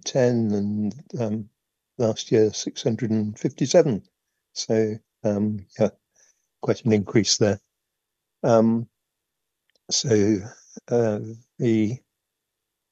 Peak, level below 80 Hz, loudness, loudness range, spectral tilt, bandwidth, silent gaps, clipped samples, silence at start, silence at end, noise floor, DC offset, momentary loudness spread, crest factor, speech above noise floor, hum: -4 dBFS; -66 dBFS; -23 LUFS; 2 LU; -5 dB/octave; 8.2 kHz; none; under 0.1%; 0.05 s; 0.95 s; -82 dBFS; under 0.1%; 12 LU; 20 dB; 60 dB; none